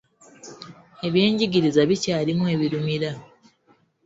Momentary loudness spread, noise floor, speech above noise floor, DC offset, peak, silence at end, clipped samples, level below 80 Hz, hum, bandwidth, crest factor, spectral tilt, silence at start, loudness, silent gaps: 21 LU; -62 dBFS; 41 dB; under 0.1%; -4 dBFS; 0.8 s; under 0.1%; -60 dBFS; none; 8 kHz; 20 dB; -6 dB/octave; 0.45 s; -22 LUFS; none